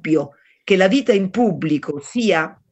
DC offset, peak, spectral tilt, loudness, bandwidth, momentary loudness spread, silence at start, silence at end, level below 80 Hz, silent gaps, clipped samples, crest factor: under 0.1%; -2 dBFS; -6 dB/octave; -18 LUFS; 8.4 kHz; 10 LU; 0.05 s; 0.2 s; -62 dBFS; none; under 0.1%; 16 dB